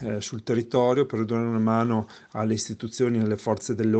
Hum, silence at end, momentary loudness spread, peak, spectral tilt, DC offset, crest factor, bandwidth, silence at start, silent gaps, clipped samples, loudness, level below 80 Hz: none; 0 s; 8 LU; -8 dBFS; -6.5 dB/octave; under 0.1%; 16 dB; 8.8 kHz; 0 s; none; under 0.1%; -25 LUFS; -64 dBFS